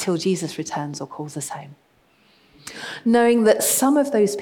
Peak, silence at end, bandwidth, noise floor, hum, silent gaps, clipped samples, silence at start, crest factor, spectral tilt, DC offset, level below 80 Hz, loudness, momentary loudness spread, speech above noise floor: -4 dBFS; 0 s; 19 kHz; -58 dBFS; none; none; under 0.1%; 0 s; 18 dB; -4 dB/octave; under 0.1%; -68 dBFS; -20 LUFS; 17 LU; 38 dB